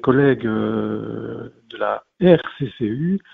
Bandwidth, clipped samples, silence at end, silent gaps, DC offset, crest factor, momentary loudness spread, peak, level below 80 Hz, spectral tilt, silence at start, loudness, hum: 4.4 kHz; under 0.1%; 0.15 s; none; under 0.1%; 20 dB; 15 LU; 0 dBFS; -52 dBFS; -10 dB/octave; 0.05 s; -20 LUFS; none